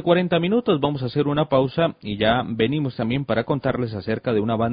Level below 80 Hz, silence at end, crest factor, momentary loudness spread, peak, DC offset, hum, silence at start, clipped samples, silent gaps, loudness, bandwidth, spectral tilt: -48 dBFS; 0 s; 16 dB; 5 LU; -4 dBFS; under 0.1%; none; 0 s; under 0.1%; none; -22 LUFS; 5.2 kHz; -11.5 dB/octave